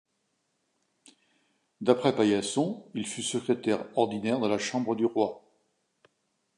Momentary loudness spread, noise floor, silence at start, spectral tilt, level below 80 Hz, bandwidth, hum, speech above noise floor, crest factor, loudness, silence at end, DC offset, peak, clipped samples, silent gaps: 7 LU; -77 dBFS; 1.8 s; -4.5 dB/octave; -72 dBFS; 11.5 kHz; none; 49 dB; 22 dB; -28 LUFS; 1.2 s; under 0.1%; -8 dBFS; under 0.1%; none